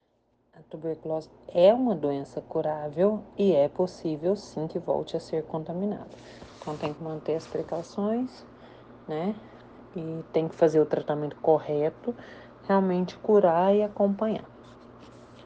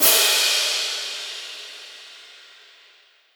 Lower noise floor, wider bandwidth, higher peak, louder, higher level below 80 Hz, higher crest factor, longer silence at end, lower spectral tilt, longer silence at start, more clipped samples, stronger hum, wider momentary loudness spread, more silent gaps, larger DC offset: first, -69 dBFS vs -55 dBFS; second, 8.8 kHz vs over 20 kHz; second, -8 dBFS vs -2 dBFS; second, -27 LUFS vs -19 LUFS; first, -64 dBFS vs under -90 dBFS; about the same, 20 dB vs 22 dB; second, 0.05 s vs 1 s; first, -8 dB/octave vs 3 dB/octave; first, 0.6 s vs 0 s; neither; neither; second, 16 LU vs 25 LU; neither; neither